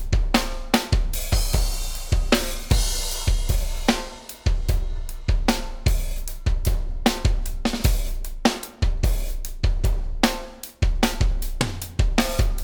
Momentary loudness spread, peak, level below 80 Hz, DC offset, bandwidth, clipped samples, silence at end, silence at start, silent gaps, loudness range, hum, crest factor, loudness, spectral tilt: 6 LU; -2 dBFS; -24 dBFS; under 0.1%; over 20 kHz; under 0.1%; 0 s; 0 s; none; 2 LU; none; 20 dB; -25 LUFS; -4.5 dB/octave